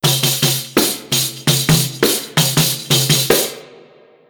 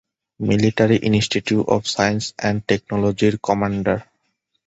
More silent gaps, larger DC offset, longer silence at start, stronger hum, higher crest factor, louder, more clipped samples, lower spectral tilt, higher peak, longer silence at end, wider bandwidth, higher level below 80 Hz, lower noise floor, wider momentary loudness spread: neither; neither; second, 0.05 s vs 0.4 s; neither; about the same, 16 dB vs 18 dB; first, -14 LUFS vs -19 LUFS; neither; second, -3 dB/octave vs -5.5 dB/octave; about the same, 0 dBFS vs -2 dBFS; about the same, 0.55 s vs 0.65 s; first, over 20 kHz vs 8.2 kHz; about the same, -46 dBFS vs -46 dBFS; second, -46 dBFS vs -71 dBFS; about the same, 4 LU vs 6 LU